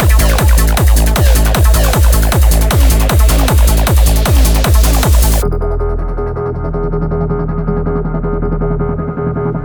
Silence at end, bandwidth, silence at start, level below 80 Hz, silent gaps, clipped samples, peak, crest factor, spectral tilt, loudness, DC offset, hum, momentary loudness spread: 0 s; over 20 kHz; 0 s; -12 dBFS; none; under 0.1%; 0 dBFS; 10 dB; -5 dB/octave; -12 LUFS; under 0.1%; none; 7 LU